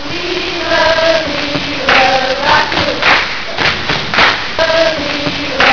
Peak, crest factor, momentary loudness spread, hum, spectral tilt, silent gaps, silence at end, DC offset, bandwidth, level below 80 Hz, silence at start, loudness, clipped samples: 0 dBFS; 12 dB; 6 LU; none; -3.5 dB/octave; none; 0 s; 4%; 5.4 kHz; -36 dBFS; 0 s; -11 LUFS; under 0.1%